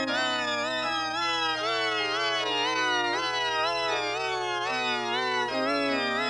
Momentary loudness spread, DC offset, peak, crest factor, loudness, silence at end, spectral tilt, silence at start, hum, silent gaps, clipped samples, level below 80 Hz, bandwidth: 3 LU; under 0.1%; -14 dBFS; 12 dB; -27 LUFS; 0 s; -2 dB/octave; 0 s; none; none; under 0.1%; -64 dBFS; 12 kHz